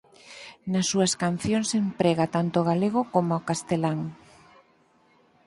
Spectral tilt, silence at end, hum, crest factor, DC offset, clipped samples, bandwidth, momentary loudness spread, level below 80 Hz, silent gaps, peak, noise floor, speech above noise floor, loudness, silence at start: -5 dB/octave; 1.3 s; none; 20 dB; under 0.1%; under 0.1%; 11.5 kHz; 14 LU; -60 dBFS; none; -8 dBFS; -62 dBFS; 37 dB; -25 LUFS; 0.25 s